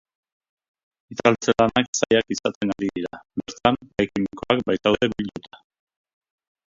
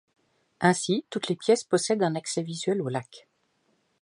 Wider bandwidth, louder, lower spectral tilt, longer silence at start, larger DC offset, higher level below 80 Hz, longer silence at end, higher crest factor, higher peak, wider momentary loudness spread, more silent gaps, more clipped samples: second, 7.8 kHz vs 11.5 kHz; first, -22 LUFS vs -27 LUFS; about the same, -4.5 dB/octave vs -4.5 dB/octave; first, 1.1 s vs 0.6 s; neither; first, -52 dBFS vs -76 dBFS; first, 1.3 s vs 0.85 s; about the same, 24 dB vs 22 dB; first, 0 dBFS vs -6 dBFS; first, 13 LU vs 8 LU; first, 1.88-1.93 s, 2.55-2.61 s vs none; neither